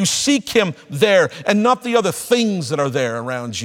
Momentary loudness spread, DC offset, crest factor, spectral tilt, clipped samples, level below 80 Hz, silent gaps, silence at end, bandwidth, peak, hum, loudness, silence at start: 7 LU; under 0.1%; 18 dB; -4 dB/octave; under 0.1%; -58 dBFS; none; 0 s; 17.5 kHz; 0 dBFS; none; -17 LUFS; 0 s